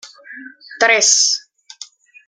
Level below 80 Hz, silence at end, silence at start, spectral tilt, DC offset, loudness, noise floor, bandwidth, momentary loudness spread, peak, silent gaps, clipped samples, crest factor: -80 dBFS; 0.45 s; 0.05 s; 2.5 dB/octave; under 0.1%; -12 LUFS; -40 dBFS; 11.5 kHz; 25 LU; 0 dBFS; none; under 0.1%; 18 dB